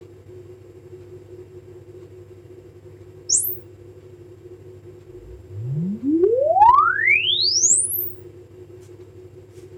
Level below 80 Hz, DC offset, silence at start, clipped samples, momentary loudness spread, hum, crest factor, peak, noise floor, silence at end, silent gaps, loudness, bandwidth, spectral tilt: -54 dBFS; under 0.1%; 0 s; under 0.1%; 25 LU; none; 22 dB; -2 dBFS; -43 dBFS; 0 s; none; -17 LUFS; 17 kHz; -2 dB/octave